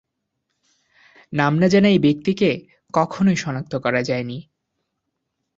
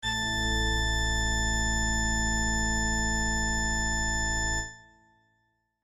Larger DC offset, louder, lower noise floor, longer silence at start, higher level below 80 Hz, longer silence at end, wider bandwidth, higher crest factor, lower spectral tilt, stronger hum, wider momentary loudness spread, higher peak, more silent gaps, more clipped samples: neither; first, -19 LUFS vs -27 LUFS; about the same, -77 dBFS vs -74 dBFS; first, 1.3 s vs 0 s; second, -56 dBFS vs -34 dBFS; about the same, 1.15 s vs 1.05 s; second, 7.6 kHz vs 13 kHz; first, 20 dB vs 12 dB; first, -6.5 dB/octave vs -2.5 dB/octave; neither; first, 13 LU vs 1 LU; first, -2 dBFS vs -16 dBFS; neither; neither